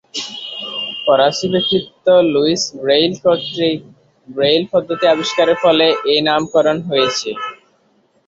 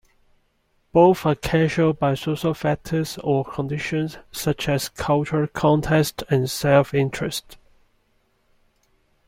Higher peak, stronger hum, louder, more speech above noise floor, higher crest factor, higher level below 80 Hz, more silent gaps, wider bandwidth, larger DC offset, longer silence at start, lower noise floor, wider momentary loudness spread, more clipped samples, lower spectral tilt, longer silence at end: about the same, -2 dBFS vs -4 dBFS; neither; first, -15 LUFS vs -21 LUFS; about the same, 43 dB vs 45 dB; about the same, 14 dB vs 18 dB; second, -58 dBFS vs -48 dBFS; neither; second, 7.8 kHz vs 16.5 kHz; neither; second, 0.15 s vs 0.95 s; second, -58 dBFS vs -66 dBFS; first, 12 LU vs 9 LU; neither; second, -4 dB/octave vs -6 dB/octave; second, 0.7 s vs 1.75 s